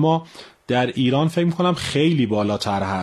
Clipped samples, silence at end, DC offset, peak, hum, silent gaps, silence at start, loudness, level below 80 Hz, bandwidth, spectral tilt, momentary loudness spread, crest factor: under 0.1%; 0 s; under 0.1%; -6 dBFS; none; none; 0 s; -20 LUFS; -54 dBFS; 12.5 kHz; -6.5 dB/octave; 5 LU; 14 dB